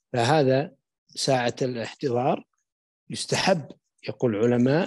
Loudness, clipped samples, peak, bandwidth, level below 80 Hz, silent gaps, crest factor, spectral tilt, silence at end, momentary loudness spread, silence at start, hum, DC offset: -24 LUFS; under 0.1%; -8 dBFS; 12.5 kHz; -68 dBFS; 0.98-1.06 s, 2.72-3.07 s; 18 dB; -5 dB/octave; 0 s; 16 LU; 0.15 s; none; under 0.1%